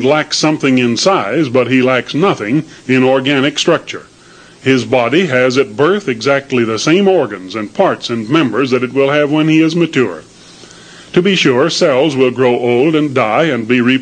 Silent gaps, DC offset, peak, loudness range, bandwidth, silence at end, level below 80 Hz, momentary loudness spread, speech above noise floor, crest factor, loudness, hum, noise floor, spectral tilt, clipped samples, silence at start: none; under 0.1%; 0 dBFS; 1 LU; 9.8 kHz; 0 s; -56 dBFS; 5 LU; 28 dB; 12 dB; -12 LUFS; none; -40 dBFS; -5 dB/octave; under 0.1%; 0 s